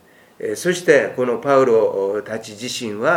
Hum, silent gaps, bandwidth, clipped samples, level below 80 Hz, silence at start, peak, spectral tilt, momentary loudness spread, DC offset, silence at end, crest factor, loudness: none; none; 16.5 kHz; under 0.1%; -68 dBFS; 0.4 s; 0 dBFS; -4.5 dB/octave; 13 LU; under 0.1%; 0 s; 18 dB; -18 LUFS